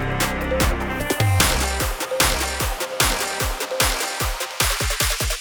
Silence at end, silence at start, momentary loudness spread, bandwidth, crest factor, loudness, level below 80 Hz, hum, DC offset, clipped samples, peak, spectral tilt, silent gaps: 0 s; 0 s; 6 LU; over 20 kHz; 20 dB; -21 LUFS; -28 dBFS; none; under 0.1%; under 0.1%; -2 dBFS; -3 dB/octave; none